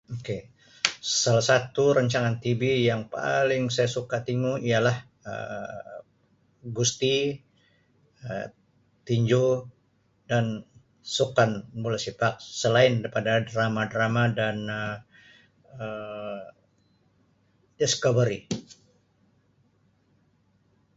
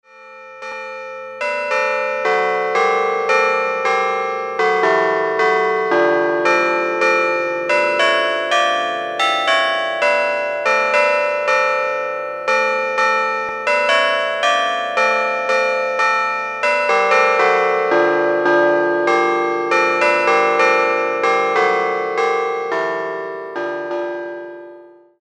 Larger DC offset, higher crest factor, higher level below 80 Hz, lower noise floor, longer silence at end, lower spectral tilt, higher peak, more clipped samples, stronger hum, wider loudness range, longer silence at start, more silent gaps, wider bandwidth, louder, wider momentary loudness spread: neither; first, 26 dB vs 16 dB; first, -62 dBFS vs -78 dBFS; first, -67 dBFS vs -42 dBFS; first, 2.25 s vs 0.35 s; first, -4.5 dB/octave vs -3 dB/octave; about the same, -2 dBFS vs 0 dBFS; neither; neither; first, 7 LU vs 3 LU; about the same, 0.1 s vs 0.15 s; neither; second, 8 kHz vs 11 kHz; second, -26 LUFS vs -16 LUFS; first, 15 LU vs 9 LU